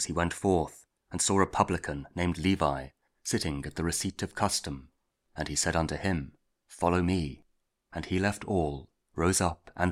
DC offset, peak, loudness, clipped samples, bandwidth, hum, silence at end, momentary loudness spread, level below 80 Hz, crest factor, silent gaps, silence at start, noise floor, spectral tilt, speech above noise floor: under 0.1%; -6 dBFS; -30 LUFS; under 0.1%; 16 kHz; none; 0 s; 14 LU; -48 dBFS; 24 dB; none; 0 s; -68 dBFS; -4.5 dB/octave; 39 dB